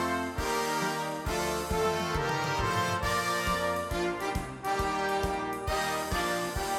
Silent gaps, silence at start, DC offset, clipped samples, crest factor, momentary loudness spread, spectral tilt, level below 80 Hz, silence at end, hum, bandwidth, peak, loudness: none; 0 s; under 0.1%; under 0.1%; 14 dB; 4 LU; -4 dB/octave; -44 dBFS; 0 s; none; 17 kHz; -16 dBFS; -30 LUFS